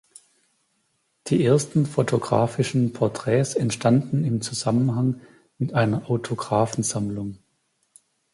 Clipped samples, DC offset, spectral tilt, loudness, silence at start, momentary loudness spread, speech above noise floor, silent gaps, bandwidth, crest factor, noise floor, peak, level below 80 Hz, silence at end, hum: under 0.1%; under 0.1%; -6 dB/octave; -23 LUFS; 1.25 s; 7 LU; 48 dB; none; 11.5 kHz; 18 dB; -71 dBFS; -6 dBFS; -58 dBFS; 1 s; none